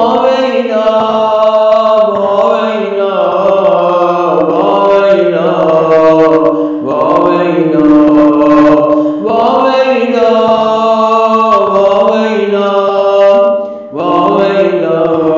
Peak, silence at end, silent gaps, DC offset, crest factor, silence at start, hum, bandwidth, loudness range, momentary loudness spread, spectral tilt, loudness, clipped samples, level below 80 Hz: 0 dBFS; 0 s; none; 0.1%; 8 dB; 0 s; none; 7.4 kHz; 2 LU; 5 LU; -7 dB/octave; -9 LUFS; under 0.1%; -48 dBFS